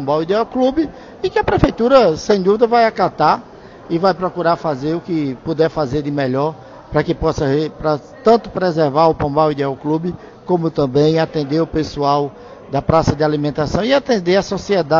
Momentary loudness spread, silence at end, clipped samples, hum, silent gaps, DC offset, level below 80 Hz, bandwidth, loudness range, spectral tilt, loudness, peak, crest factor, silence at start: 8 LU; 0 s; under 0.1%; none; none; under 0.1%; -38 dBFS; 7.6 kHz; 4 LU; -6.5 dB/octave; -17 LUFS; 0 dBFS; 16 dB; 0 s